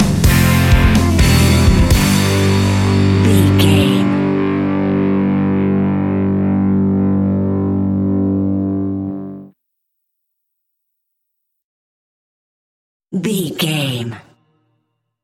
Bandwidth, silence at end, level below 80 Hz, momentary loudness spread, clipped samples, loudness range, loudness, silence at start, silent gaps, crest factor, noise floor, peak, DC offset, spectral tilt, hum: 17 kHz; 1.05 s; -24 dBFS; 9 LU; under 0.1%; 13 LU; -14 LUFS; 0 s; 11.64-13.00 s; 14 dB; -73 dBFS; 0 dBFS; under 0.1%; -6 dB/octave; none